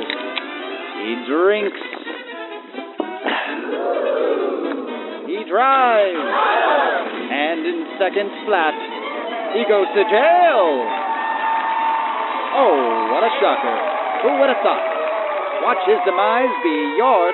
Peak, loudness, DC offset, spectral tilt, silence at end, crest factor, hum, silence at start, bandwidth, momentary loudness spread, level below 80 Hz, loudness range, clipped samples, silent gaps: -2 dBFS; -18 LUFS; under 0.1%; 0 dB/octave; 0 s; 16 dB; none; 0 s; 4.2 kHz; 12 LU; under -90 dBFS; 6 LU; under 0.1%; none